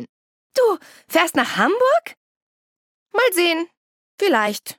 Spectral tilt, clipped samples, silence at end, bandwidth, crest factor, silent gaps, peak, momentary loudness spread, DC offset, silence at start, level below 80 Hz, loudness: -3 dB/octave; under 0.1%; 0.05 s; 17.5 kHz; 18 dB; 0.09-0.50 s, 2.17-3.06 s, 3.77-4.18 s; -4 dBFS; 9 LU; under 0.1%; 0 s; -72 dBFS; -19 LUFS